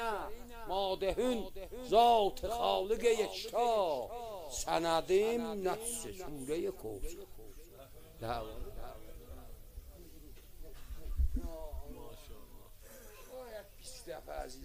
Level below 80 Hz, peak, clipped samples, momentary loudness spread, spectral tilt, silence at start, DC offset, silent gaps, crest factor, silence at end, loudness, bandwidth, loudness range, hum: -46 dBFS; -14 dBFS; under 0.1%; 24 LU; -4 dB/octave; 0 s; under 0.1%; none; 22 dB; 0 s; -35 LUFS; 16 kHz; 16 LU; none